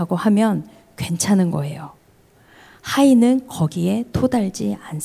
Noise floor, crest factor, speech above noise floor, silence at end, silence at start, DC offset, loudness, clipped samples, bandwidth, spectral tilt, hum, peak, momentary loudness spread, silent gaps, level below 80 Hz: -53 dBFS; 14 dB; 35 dB; 0 s; 0 s; under 0.1%; -19 LUFS; under 0.1%; 16 kHz; -6 dB/octave; none; -4 dBFS; 15 LU; none; -46 dBFS